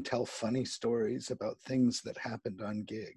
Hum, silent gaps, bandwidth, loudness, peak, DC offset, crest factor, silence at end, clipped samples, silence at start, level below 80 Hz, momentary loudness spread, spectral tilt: none; none; 11.5 kHz; -35 LUFS; -20 dBFS; under 0.1%; 16 dB; 0.05 s; under 0.1%; 0 s; -70 dBFS; 9 LU; -5 dB/octave